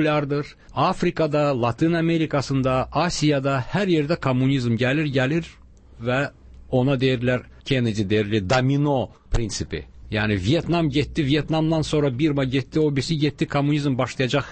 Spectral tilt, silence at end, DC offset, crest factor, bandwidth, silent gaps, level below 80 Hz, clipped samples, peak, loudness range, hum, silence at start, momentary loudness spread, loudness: -6.5 dB/octave; 0 s; under 0.1%; 12 dB; 8.8 kHz; none; -40 dBFS; under 0.1%; -8 dBFS; 2 LU; none; 0 s; 6 LU; -22 LUFS